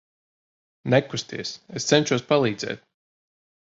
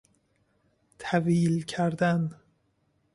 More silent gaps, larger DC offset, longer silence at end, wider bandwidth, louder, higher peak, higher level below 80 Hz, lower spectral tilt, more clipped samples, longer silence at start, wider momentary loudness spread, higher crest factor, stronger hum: neither; neither; about the same, 0.9 s vs 0.8 s; second, 8 kHz vs 11.5 kHz; first, -24 LUFS vs -27 LUFS; first, -4 dBFS vs -10 dBFS; about the same, -62 dBFS vs -66 dBFS; second, -4.5 dB/octave vs -7 dB/octave; neither; second, 0.85 s vs 1 s; first, 12 LU vs 8 LU; about the same, 22 dB vs 18 dB; neither